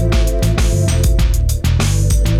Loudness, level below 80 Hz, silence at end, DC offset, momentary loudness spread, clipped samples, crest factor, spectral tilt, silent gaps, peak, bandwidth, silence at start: -15 LUFS; -16 dBFS; 0 s; under 0.1%; 2 LU; under 0.1%; 10 dB; -5.5 dB/octave; none; -2 dBFS; 15.5 kHz; 0 s